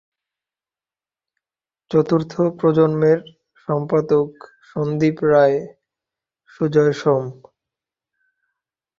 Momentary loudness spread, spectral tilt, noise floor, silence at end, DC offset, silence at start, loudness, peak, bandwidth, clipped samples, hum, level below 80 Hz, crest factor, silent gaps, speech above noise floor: 11 LU; -8.5 dB/octave; under -90 dBFS; 1.65 s; under 0.1%; 1.9 s; -18 LUFS; -2 dBFS; 7.2 kHz; under 0.1%; none; -60 dBFS; 18 dB; none; over 73 dB